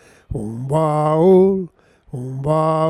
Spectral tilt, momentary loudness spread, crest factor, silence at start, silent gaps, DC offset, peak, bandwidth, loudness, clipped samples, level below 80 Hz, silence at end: -9 dB/octave; 19 LU; 14 dB; 0.3 s; none; under 0.1%; -2 dBFS; 11 kHz; -17 LUFS; under 0.1%; -44 dBFS; 0 s